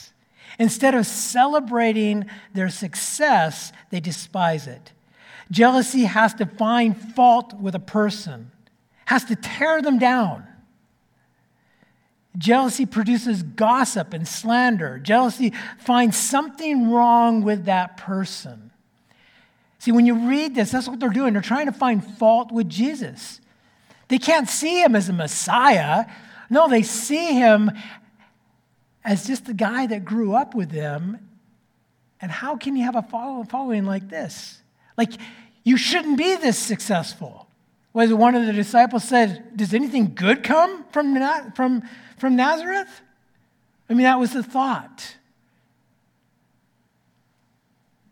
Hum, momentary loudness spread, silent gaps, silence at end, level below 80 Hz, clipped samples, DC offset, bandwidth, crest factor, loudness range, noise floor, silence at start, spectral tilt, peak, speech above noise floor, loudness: none; 14 LU; none; 3 s; -70 dBFS; under 0.1%; under 0.1%; 18 kHz; 20 dB; 6 LU; -66 dBFS; 0 s; -4.5 dB/octave; 0 dBFS; 46 dB; -20 LUFS